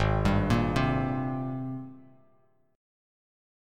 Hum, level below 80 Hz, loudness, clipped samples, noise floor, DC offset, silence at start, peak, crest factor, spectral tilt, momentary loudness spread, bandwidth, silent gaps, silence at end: none; -40 dBFS; -28 LUFS; under 0.1%; -67 dBFS; under 0.1%; 0 s; -10 dBFS; 20 dB; -7.5 dB/octave; 13 LU; 13 kHz; none; 1.75 s